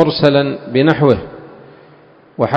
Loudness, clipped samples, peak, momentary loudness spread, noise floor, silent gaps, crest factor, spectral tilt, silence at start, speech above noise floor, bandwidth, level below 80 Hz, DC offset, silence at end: -14 LUFS; 0.2%; 0 dBFS; 22 LU; -45 dBFS; none; 16 dB; -8 dB/octave; 0 s; 32 dB; 8 kHz; -44 dBFS; under 0.1%; 0 s